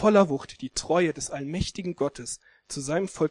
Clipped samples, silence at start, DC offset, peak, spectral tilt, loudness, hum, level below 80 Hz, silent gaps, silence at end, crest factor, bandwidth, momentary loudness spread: under 0.1%; 0 s; under 0.1%; -6 dBFS; -5 dB/octave; -28 LUFS; none; -50 dBFS; none; 0 s; 20 dB; 12 kHz; 13 LU